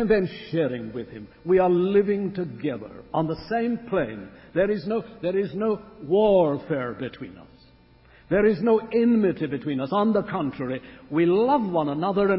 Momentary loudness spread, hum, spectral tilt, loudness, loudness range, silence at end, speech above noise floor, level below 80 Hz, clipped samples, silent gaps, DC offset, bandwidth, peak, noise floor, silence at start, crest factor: 13 LU; none; -11.5 dB/octave; -24 LUFS; 3 LU; 0 s; 31 dB; -54 dBFS; under 0.1%; none; under 0.1%; 5.8 kHz; -8 dBFS; -54 dBFS; 0 s; 16 dB